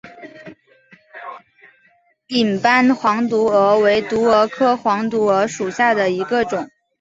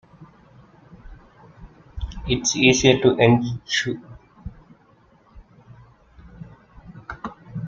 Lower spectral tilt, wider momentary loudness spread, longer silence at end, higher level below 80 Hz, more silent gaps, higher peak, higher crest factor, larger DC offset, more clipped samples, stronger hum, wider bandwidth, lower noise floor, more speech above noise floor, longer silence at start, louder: about the same, -5 dB/octave vs -4.5 dB/octave; second, 21 LU vs 26 LU; first, 0.35 s vs 0 s; second, -58 dBFS vs -42 dBFS; neither; about the same, -2 dBFS vs 0 dBFS; second, 16 dB vs 24 dB; neither; neither; neither; about the same, 8 kHz vs 7.6 kHz; about the same, -58 dBFS vs -56 dBFS; first, 42 dB vs 38 dB; second, 0.05 s vs 0.2 s; first, -16 LUFS vs -19 LUFS